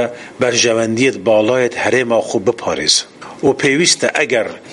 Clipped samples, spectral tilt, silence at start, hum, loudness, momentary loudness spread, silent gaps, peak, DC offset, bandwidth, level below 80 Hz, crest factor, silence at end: under 0.1%; -3 dB/octave; 0 s; none; -14 LUFS; 6 LU; none; 0 dBFS; under 0.1%; 11.5 kHz; -54 dBFS; 16 dB; 0 s